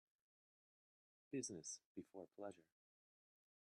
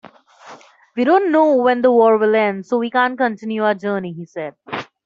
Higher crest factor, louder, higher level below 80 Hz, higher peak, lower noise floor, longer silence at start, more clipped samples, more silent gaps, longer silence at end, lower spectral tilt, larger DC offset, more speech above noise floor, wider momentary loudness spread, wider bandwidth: first, 22 dB vs 14 dB; second, -53 LUFS vs -16 LUFS; second, under -90 dBFS vs -66 dBFS; second, -36 dBFS vs -2 dBFS; first, under -90 dBFS vs -43 dBFS; first, 1.3 s vs 0.45 s; neither; first, 1.85-1.95 s vs none; first, 1.15 s vs 0.2 s; second, -3.5 dB/octave vs -7 dB/octave; neither; first, over 36 dB vs 26 dB; second, 10 LU vs 16 LU; first, 10.5 kHz vs 7.4 kHz